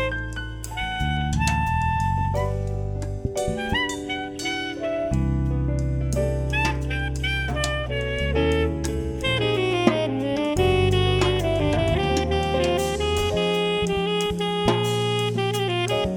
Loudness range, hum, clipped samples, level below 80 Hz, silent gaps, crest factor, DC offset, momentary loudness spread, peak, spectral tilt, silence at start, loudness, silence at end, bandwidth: 4 LU; none; under 0.1%; -32 dBFS; none; 20 dB; under 0.1%; 7 LU; -2 dBFS; -5.5 dB/octave; 0 s; -24 LUFS; 0 s; 19.5 kHz